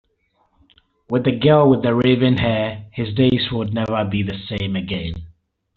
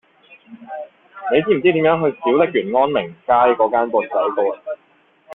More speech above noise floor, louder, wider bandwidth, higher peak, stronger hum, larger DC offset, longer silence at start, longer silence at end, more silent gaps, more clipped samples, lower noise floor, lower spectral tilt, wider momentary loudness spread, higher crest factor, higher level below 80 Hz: first, 47 dB vs 40 dB; about the same, -19 LUFS vs -17 LUFS; first, 4.8 kHz vs 4 kHz; about the same, -2 dBFS vs -2 dBFS; neither; neither; first, 1.1 s vs 0.5 s; first, 0.45 s vs 0 s; neither; neither; first, -64 dBFS vs -56 dBFS; second, -5.5 dB/octave vs -9 dB/octave; second, 12 LU vs 18 LU; about the same, 16 dB vs 18 dB; first, -44 dBFS vs -60 dBFS